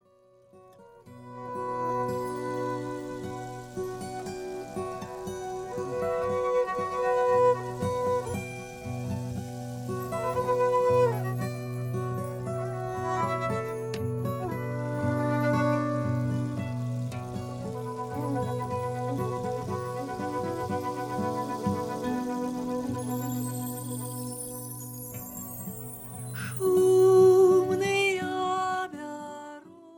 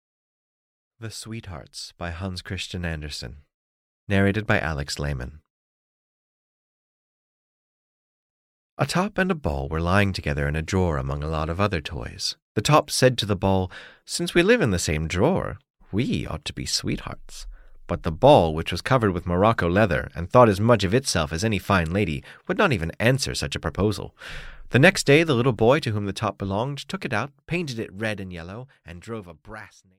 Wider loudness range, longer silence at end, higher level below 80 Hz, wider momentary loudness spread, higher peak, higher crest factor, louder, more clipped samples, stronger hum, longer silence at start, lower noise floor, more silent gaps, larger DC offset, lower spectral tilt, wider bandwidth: about the same, 11 LU vs 10 LU; second, 0 s vs 0.3 s; second, -58 dBFS vs -42 dBFS; second, 14 LU vs 19 LU; second, -12 dBFS vs -4 dBFS; about the same, 18 dB vs 20 dB; second, -29 LUFS vs -23 LUFS; neither; neither; second, 0.55 s vs 1 s; second, -60 dBFS vs under -90 dBFS; second, none vs 3.54-4.07 s, 5.50-8.77 s, 12.42-12.55 s, 15.70-15.74 s; neither; first, -6.5 dB/octave vs -5 dB/octave; first, 19 kHz vs 16 kHz